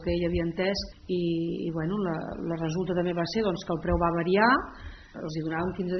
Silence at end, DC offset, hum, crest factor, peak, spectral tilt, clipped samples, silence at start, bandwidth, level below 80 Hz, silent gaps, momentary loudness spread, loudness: 0 s; under 0.1%; none; 20 dB; -8 dBFS; -5 dB/octave; under 0.1%; 0 s; 6.4 kHz; -44 dBFS; none; 10 LU; -28 LUFS